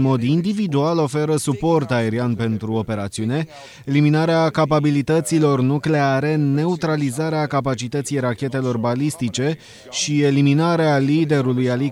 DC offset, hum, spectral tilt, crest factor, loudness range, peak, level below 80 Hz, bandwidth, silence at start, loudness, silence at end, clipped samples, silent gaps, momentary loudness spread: under 0.1%; none; -6 dB/octave; 14 dB; 3 LU; -4 dBFS; -54 dBFS; 13 kHz; 0 s; -19 LUFS; 0 s; under 0.1%; none; 7 LU